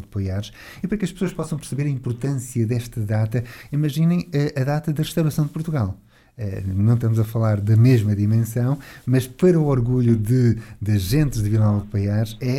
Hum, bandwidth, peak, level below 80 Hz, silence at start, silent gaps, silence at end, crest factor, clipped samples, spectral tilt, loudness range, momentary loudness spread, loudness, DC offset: none; 15.5 kHz; -6 dBFS; -42 dBFS; 0 s; none; 0 s; 14 dB; under 0.1%; -7.5 dB/octave; 6 LU; 10 LU; -21 LUFS; under 0.1%